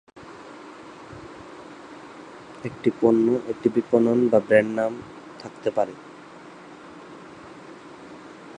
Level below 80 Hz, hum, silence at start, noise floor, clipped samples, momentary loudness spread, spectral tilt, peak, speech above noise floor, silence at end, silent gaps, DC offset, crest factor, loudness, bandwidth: -64 dBFS; none; 0.15 s; -44 dBFS; under 0.1%; 24 LU; -7.5 dB/octave; -4 dBFS; 22 dB; 0 s; none; under 0.1%; 22 dB; -22 LUFS; 10 kHz